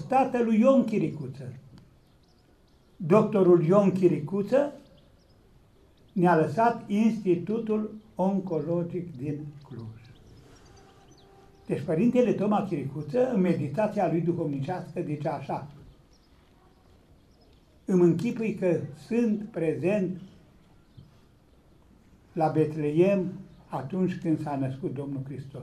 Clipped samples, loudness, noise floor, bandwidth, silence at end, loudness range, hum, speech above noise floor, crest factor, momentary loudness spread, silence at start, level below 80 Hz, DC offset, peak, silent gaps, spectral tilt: under 0.1%; -26 LUFS; -60 dBFS; 12 kHz; 0 s; 8 LU; none; 35 dB; 20 dB; 15 LU; 0 s; -62 dBFS; under 0.1%; -8 dBFS; none; -8.5 dB/octave